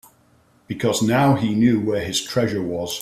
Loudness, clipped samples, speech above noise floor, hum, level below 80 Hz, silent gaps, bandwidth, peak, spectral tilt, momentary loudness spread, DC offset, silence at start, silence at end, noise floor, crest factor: -20 LUFS; under 0.1%; 38 dB; none; -54 dBFS; none; 15 kHz; -6 dBFS; -5 dB/octave; 8 LU; under 0.1%; 0.7 s; 0 s; -57 dBFS; 16 dB